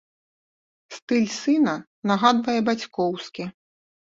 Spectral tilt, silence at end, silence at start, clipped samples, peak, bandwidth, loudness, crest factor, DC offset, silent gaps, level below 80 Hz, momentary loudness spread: -5 dB/octave; 0.65 s; 0.9 s; under 0.1%; -4 dBFS; 7.8 kHz; -23 LUFS; 20 dB; under 0.1%; 1.02-1.08 s, 1.87-2.02 s; -68 dBFS; 16 LU